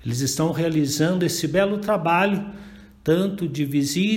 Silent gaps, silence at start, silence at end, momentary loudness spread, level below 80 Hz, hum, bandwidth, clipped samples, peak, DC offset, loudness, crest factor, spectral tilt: none; 0 s; 0 s; 7 LU; -52 dBFS; none; 16.5 kHz; under 0.1%; -6 dBFS; under 0.1%; -22 LUFS; 16 dB; -5 dB/octave